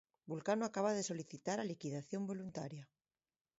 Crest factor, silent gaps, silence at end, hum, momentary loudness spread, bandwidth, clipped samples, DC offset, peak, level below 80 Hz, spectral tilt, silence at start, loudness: 18 dB; none; 0.75 s; none; 11 LU; 7.6 kHz; under 0.1%; under 0.1%; -24 dBFS; -82 dBFS; -5.5 dB/octave; 0.25 s; -42 LUFS